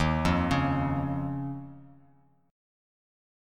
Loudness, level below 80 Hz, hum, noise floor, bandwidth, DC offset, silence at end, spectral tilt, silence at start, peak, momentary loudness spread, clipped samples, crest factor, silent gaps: -29 LUFS; -44 dBFS; none; -63 dBFS; 12.5 kHz; under 0.1%; 1.55 s; -7 dB/octave; 0 s; -12 dBFS; 14 LU; under 0.1%; 18 dB; none